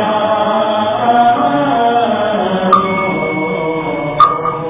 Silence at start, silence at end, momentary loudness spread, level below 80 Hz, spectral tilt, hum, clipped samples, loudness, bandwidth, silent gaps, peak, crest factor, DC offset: 0 s; 0 s; 6 LU; -46 dBFS; -9.5 dB/octave; none; 0.2%; -13 LUFS; 4 kHz; none; 0 dBFS; 12 dB; under 0.1%